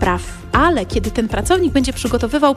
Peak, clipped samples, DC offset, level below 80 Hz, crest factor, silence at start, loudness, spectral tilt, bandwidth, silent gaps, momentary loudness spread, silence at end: -2 dBFS; under 0.1%; under 0.1%; -28 dBFS; 14 dB; 0 s; -17 LUFS; -5 dB/octave; 15.5 kHz; none; 5 LU; 0 s